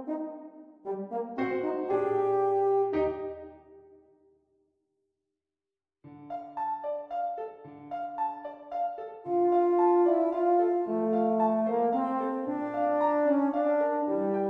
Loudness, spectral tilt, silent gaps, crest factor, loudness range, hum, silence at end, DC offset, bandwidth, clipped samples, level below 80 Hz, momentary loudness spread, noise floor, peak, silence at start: -28 LUFS; -9 dB/octave; none; 14 dB; 13 LU; none; 0 s; under 0.1%; 4.5 kHz; under 0.1%; -68 dBFS; 15 LU; under -90 dBFS; -14 dBFS; 0 s